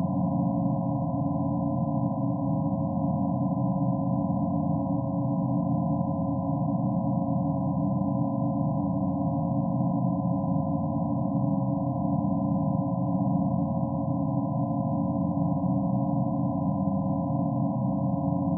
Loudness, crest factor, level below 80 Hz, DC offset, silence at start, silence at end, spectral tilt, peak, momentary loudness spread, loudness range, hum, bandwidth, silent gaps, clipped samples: -27 LUFS; 12 dB; -54 dBFS; under 0.1%; 0 s; 0 s; -6 dB/octave; -14 dBFS; 2 LU; 0 LU; none; 1.2 kHz; none; under 0.1%